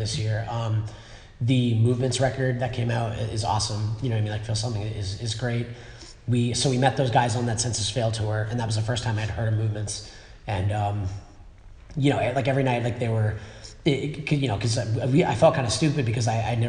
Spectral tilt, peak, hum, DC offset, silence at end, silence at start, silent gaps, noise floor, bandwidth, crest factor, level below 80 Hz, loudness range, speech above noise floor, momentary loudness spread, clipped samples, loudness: -5.5 dB/octave; -4 dBFS; none; under 0.1%; 0 s; 0 s; none; -46 dBFS; 10.5 kHz; 20 dB; -46 dBFS; 4 LU; 21 dB; 9 LU; under 0.1%; -25 LUFS